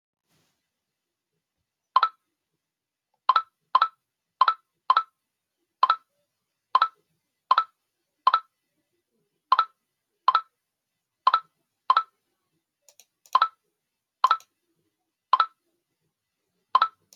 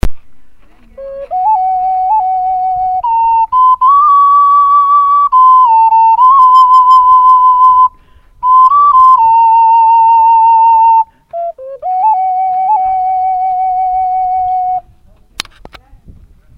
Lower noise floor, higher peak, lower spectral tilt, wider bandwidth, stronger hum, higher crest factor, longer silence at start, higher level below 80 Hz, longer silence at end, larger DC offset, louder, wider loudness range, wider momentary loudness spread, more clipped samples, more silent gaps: first, -87 dBFS vs -43 dBFS; second, -6 dBFS vs 0 dBFS; second, 1 dB/octave vs -4.5 dB/octave; second, 7.4 kHz vs 11 kHz; neither; first, 24 dB vs 8 dB; first, 1.95 s vs 0.05 s; second, under -90 dBFS vs -34 dBFS; second, 0.3 s vs 1.8 s; neither; second, -25 LUFS vs -7 LUFS; second, 3 LU vs 8 LU; second, 4 LU vs 14 LU; second, under 0.1% vs 0.2%; neither